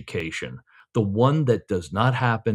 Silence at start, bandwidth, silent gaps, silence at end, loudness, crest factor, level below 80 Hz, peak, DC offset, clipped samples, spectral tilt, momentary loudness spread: 0 s; 11 kHz; none; 0 s; -23 LUFS; 18 dB; -58 dBFS; -4 dBFS; under 0.1%; under 0.1%; -7 dB/octave; 10 LU